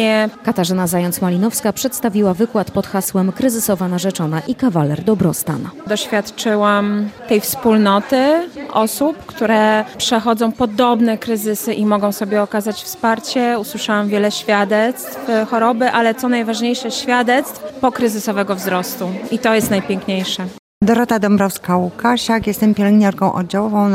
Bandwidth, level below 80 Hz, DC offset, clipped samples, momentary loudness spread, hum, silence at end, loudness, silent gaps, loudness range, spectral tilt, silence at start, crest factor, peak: 16.5 kHz; -52 dBFS; under 0.1%; under 0.1%; 6 LU; none; 0 s; -16 LUFS; 20.59-20.81 s; 2 LU; -5 dB/octave; 0 s; 14 dB; -2 dBFS